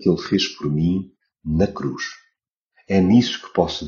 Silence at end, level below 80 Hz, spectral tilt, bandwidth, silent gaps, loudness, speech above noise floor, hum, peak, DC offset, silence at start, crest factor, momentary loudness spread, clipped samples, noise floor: 0 s; -42 dBFS; -5.5 dB/octave; 7.2 kHz; 2.52-2.70 s; -21 LUFS; 53 dB; none; -2 dBFS; under 0.1%; 0 s; 20 dB; 14 LU; under 0.1%; -73 dBFS